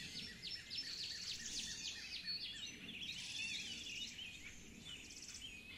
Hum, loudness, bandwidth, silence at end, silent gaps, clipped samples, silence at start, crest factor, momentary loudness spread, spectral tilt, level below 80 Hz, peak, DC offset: none; -46 LUFS; 16 kHz; 0 s; none; under 0.1%; 0 s; 16 dB; 8 LU; -0.5 dB/octave; -68 dBFS; -34 dBFS; under 0.1%